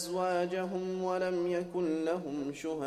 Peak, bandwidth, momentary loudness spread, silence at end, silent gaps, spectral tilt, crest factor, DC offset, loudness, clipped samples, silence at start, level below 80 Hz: -20 dBFS; 14 kHz; 5 LU; 0 s; none; -5.5 dB/octave; 12 dB; under 0.1%; -34 LUFS; under 0.1%; 0 s; -68 dBFS